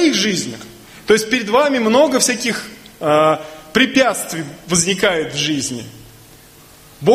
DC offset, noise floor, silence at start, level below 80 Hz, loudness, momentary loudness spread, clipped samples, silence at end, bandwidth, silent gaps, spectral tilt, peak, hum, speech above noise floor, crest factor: under 0.1%; -44 dBFS; 0 s; -52 dBFS; -16 LUFS; 15 LU; under 0.1%; 0 s; 15.5 kHz; none; -3 dB/octave; 0 dBFS; none; 27 dB; 18 dB